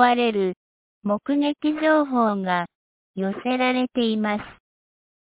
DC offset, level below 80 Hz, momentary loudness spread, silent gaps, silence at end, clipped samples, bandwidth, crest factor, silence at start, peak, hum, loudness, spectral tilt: under 0.1%; -64 dBFS; 13 LU; 0.56-1.02 s, 2.75-3.14 s; 0.75 s; under 0.1%; 4 kHz; 20 dB; 0 s; -4 dBFS; none; -23 LUFS; -9.5 dB/octave